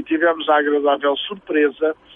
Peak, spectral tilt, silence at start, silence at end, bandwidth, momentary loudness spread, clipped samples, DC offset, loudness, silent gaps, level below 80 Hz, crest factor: -4 dBFS; -6.5 dB/octave; 0 s; 0.25 s; 3.8 kHz; 6 LU; under 0.1%; under 0.1%; -18 LUFS; none; -64 dBFS; 14 dB